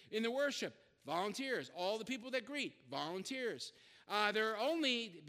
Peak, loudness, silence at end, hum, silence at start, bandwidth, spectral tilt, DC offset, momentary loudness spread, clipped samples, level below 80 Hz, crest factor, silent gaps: -18 dBFS; -39 LUFS; 0 s; none; 0 s; 15.5 kHz; -3 dB/octave; under 0.1%; 8 LU; under 0.1%; -88 dBFS; 22 dB; none